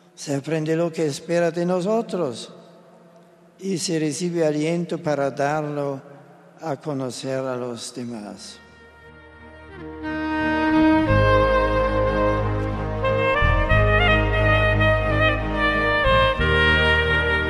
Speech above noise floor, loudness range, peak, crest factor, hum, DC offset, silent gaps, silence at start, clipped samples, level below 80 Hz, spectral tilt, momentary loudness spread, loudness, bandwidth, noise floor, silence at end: 27 dB; 12 LU; -4 dBFS; 16 dB; none; under 0.1%; none; 0.2 s; under 0.1%; -32 dBFS; -5.5 dB/octave; 14 LU; -21 LUFS; 12.5 kHz; -51 dBFS; 0 s